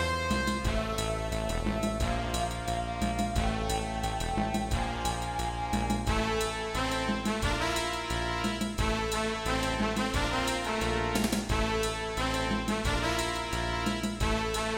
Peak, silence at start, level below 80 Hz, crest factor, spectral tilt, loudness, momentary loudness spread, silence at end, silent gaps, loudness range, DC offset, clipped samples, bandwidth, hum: -14 dBFS; 0 s; -38 dBFS; 16 dB; -4.5 dB/octave; -30 LUFS; 3 LU; 0 s; none; 2 LU; under 0.1%; under 0.1%; 16.5 kHz; none